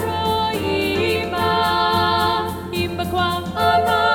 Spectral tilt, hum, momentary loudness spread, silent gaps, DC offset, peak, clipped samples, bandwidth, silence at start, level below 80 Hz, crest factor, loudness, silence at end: -5 dB/octave; none; 6 LU; none; under 0.1%; -4 dBFS; under 0.1%; 19 kHz; 0 s; -44 dBFS; 14 dB; -19 LUFS; 0 s